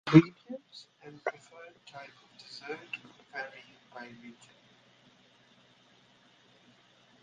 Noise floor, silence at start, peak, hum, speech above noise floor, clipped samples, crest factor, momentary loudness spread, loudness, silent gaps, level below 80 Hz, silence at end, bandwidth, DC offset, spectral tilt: -63 dBFS; 0.05 s; -4 dBFS; none; 36 dB; under 0.1%; 30 dB; 13 LU; -33 LUFS; none; -68 dBFS; 2.9 s; 7.6 kHz; under 0.1%; -7.5 dB/octave